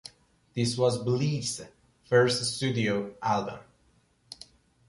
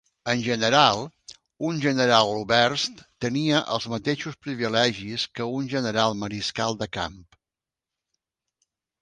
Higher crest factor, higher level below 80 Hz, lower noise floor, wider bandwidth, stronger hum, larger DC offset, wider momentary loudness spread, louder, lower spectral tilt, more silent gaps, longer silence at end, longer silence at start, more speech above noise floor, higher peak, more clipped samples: about the same, 20 dB vs 22 dB; about the same, -62 dBFS vs -58 dBFS; second, -66 dBFS vs -90 dBFS; about the same, 11.5 kHz vs 10.5 kHz; neither; neither; first, 22 LU vs 11 LU; second, -28 LUFS vs -24 LUFS; about the same, -5 dB/octave vs -4 dB/octave; neither; second, 0.55 s vs 1.8 s; second, 0.05 s vs 0.25 s; second, 39 dB vs 66 dB; second, -10 dBFS vs -2 dBFS; neither